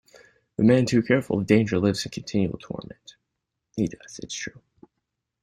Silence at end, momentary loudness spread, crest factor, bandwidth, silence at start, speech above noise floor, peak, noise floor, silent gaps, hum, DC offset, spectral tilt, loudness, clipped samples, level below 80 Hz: 0.9 s; 17 LU; 20 dB; 14.5 kHz; 0.6 s; 58 dB; -4 dBFS; -82 dBFS; none; none; under 0.1%; -6 dB/octave; -24 LUFS; under 0.1%; -56 dBFS